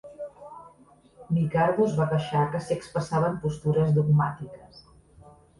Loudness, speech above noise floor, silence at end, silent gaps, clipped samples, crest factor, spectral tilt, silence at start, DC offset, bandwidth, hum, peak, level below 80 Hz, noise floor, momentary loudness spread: -25 LUFS; 32 dB; 0.8 s; none; under 0.1%; 16 dB; -8 dB/octave; 0.05 s; under 0.1%; 11.5 kHz; none; -10 dBFS; -56 dBFS; -56 dBFS; 18 LU